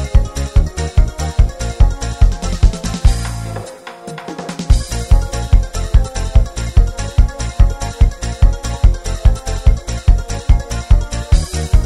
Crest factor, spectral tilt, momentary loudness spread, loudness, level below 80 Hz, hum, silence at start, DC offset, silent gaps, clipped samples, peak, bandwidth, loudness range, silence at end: 14 dB; -5.5 dB/octave; 6 LU; -17 LUFS; -14 dBFS; none; 0 s; under 0.1%; none; 1%; 0 dBFS; 12 kHz; 2 LU; 0 s